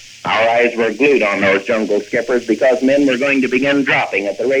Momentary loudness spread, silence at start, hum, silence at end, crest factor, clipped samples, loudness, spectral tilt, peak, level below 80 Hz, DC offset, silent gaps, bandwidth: 5 LU; 0 s; none; 0 s; 12 dB; under 0.1%; -14 LUFS; -4.5 dB/octave; -2 dBFS; -58 dBFS; under 0.1%; none; 11 kHz